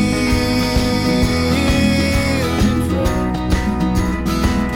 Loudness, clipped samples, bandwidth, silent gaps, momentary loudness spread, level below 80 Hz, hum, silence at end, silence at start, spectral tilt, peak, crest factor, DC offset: -17 LUFS; under 0.1%; 16.5 kHz; none; 4 LU; -24 dBFS; none; 0 s; 0 s; -5.5 dB/octave; -4 dBFS; 12 dB; under 0.1%